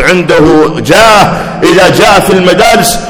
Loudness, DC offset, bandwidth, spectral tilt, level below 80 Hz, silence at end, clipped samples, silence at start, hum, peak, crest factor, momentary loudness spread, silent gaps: -5 LUFS; under 0.1%; over 20 kHz; -4 dB/octave; -28 dBFS; 0 s; 20%; 0 s; none; 0 dBFS; 4 dB; 4 LU; none